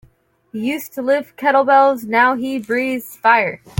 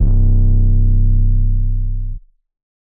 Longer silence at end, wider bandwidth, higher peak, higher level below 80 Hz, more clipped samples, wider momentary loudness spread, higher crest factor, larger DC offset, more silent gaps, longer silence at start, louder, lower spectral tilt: second, 0.25 s vs 0.8 s; first, 17 kHz vs 0.8 kHz; about the same, -2 dBFS vs -4 dBFS; second, -64 dBFS vs -14 dBFS; neither; about the same, 10 LU vs 12 LU; first, 16 dB vs 8 dB; neither; neither; first, 0.55 s vs 0 s; about the same, -16 LUFS vs -17 LUFS; second, -5 dB/octave vs -16 dB/octave